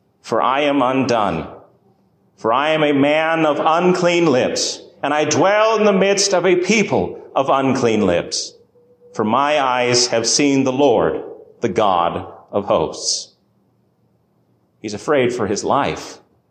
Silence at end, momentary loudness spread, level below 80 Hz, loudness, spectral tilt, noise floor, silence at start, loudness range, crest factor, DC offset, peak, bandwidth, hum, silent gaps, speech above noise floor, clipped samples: 0.35 s; 11 LU; -52 dBFS; -17 LUFS; -4 dB/octave; -60 dBFS; 0.25 s; 6 LU; 14 dB; under 0.1%; -4 dBFS; 10 kHz; none; none; 44 dB; under 0.1%